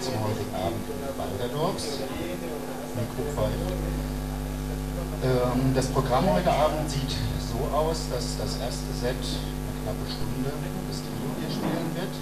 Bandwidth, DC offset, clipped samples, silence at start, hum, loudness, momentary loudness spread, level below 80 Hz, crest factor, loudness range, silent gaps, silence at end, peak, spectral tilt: 14 kHz; 0.8%; under 0.1%; 0 s; none; -29 LUFS; 8 LU; -36 dBFS; 20 dB; 5 LU; none; 0 s; -8 dBFS; -5.5 dB/octave